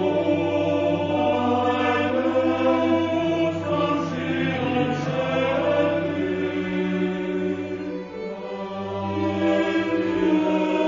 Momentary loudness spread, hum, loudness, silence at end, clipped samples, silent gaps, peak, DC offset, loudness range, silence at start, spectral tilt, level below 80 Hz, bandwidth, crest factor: 8 LU; none; -23 LUFS; 0 s; under 0.1%; none; -8 dBFS; under 0.1%; 5 LU; 0 s; -7 dB/octave; -58 dBFS; 7.6 kHz; 14 dB